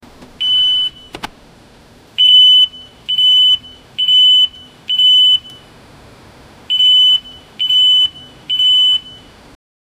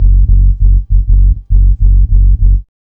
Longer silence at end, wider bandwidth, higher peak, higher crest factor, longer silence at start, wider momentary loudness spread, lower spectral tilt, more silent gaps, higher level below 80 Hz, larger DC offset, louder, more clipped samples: first, 0.9 s vs 0.2 s; first, 15.5 kHz vs 0.5 kHz; about the same, 0 dBFS vs 0 dBFS; first, 14 dB vs 6 dB; first, 0.4 s vs 0 s; first, 14 LU vs 2 LU; second, 0 dB/octave vs -14 dB/octave; neither; second, -52 dBFS vs -6 dBFS; neither; about the same, -9 LUFS vs -11 LUFS; second, under 0.1% vs 1%